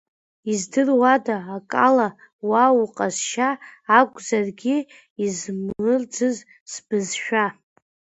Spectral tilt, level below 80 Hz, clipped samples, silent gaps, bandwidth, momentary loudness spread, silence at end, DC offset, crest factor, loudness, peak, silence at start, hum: -4 dB/octave; -66 dBFS; under 0.1%; 2.33-2.39 s, 5.10-5.16 s, 6.60-6.66 s; 8.2 kHz; 12 LU; 0.65 s; under 0.1%; 22 dB; -21 LUFS; 0 dBFS; 0.45 s; none